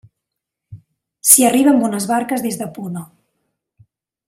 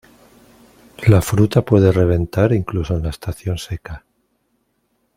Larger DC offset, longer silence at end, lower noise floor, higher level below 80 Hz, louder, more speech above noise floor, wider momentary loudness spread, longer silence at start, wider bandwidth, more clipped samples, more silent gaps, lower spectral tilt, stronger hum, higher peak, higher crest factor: neither; about the same, 1.25 s vs 1.2 s; first, -81 dBFS vs -67 dBFS; second, -62 dBFS vs -38 dBFS; first, -14 LUFS vs -17 LUFS; first, 66 dB vs 51 dB; first, 19 LU vs 15 LU; second, 0.7 s vs 1 s; about the same, 16 kHz vs 16 kHz; neither; neither; second, -3.5 dB/octave vs -7.5 dB/octave; neither; about the same, 0 dBFS vs 0 dBFS; about the same, 18 dB vs 18 dB